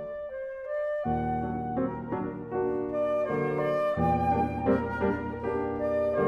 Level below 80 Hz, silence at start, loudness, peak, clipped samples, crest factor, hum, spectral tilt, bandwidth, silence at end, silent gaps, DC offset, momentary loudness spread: -48 dBFS; 0 s; -29 LUFS; -14 dBFS; under 0.1%; 14 dB; none; -9 dB/octave; 11.5 kHz; 0 s; none; under 0.1%; 7 LU